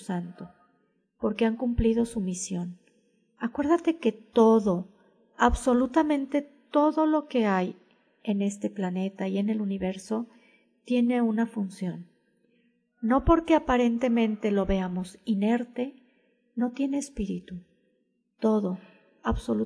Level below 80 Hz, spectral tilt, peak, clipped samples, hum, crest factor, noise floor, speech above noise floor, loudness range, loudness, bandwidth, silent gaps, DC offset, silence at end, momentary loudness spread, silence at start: -44 dBFS; -6.5 dB/octave; -6 dBFS; under 0.1%; none; 22 dB; -73 dBFS; 47 dB; 6 LU; -27 LUFS; 11 kHz; none; under 0.1%; 0 s; 13 LU; 0 s